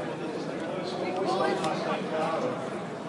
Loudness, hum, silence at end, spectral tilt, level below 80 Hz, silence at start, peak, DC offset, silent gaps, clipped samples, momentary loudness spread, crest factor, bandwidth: -30 LUFS; none; 0 s; -5.5 dB/octave; -74 dBFS; 0 s; -16 dBFS; under 0.1%; none; under 0.1%; 7 LU; 14 dB; 11.5 kHz